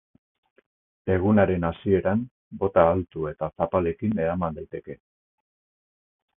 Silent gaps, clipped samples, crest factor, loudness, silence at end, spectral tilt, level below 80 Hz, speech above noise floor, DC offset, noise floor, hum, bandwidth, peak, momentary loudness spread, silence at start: 2.31-2.51 s; under 0.1%; 22 dB; -24 LUFS; 1.45 s; -12.5 dB/octave; -46 dBFS; over 66 dB; under 0.1%; under -90 dBFS; none; 3.8 kHz; -2 dBFS; 17 LU; 1.05 s